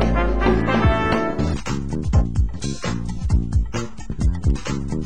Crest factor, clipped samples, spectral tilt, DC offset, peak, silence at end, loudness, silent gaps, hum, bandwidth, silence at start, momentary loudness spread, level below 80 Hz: 16 dB; under 0.1%; -6.5 dB/octave; 3%; -4 dBFS; 0 s; -22 LUFS; none; none; 10 kHz; 0 s; 8 LU; -24 dBFS